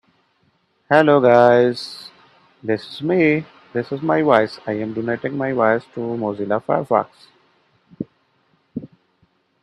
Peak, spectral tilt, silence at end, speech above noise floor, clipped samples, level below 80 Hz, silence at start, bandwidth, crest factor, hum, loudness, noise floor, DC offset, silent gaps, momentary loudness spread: 0 dBFS; -7.5 dB/octave; 0.75 s; 46 dB; under 0.1%; -64 dBFS; 0.9 s; 11.5 kHz; 20 dB; none; -18 LUFS; -63 dBFS; under 0.1%; none; 21 LU